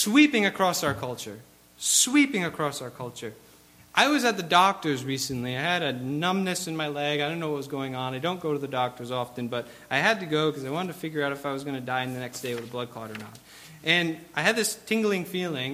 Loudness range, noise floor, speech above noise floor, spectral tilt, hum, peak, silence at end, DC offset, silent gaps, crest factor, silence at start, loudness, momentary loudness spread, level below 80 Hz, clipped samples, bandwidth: 5 LU; -52 dBFS; 25 dB; -3.5 dB/octave; none; -6 dBFS; 0 s; under 0.1%; none; 22 dB; 0 s; -26 LUFS; 14 LU; -66 dBFS; under 0.1%; 16 kHz